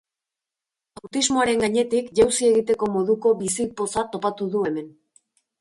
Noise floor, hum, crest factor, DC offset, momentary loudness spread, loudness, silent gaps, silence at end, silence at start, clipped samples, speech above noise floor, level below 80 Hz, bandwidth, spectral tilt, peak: -88 dBFS; none; 18 dB; under 0.1%; 7 LU; -22 LUFS; none; 0.7 s; 1.05 s; under 0.1%; 66 dB; -56 dBFS; 11.5 kHz; -3.5 dB/octave; -6 dBFS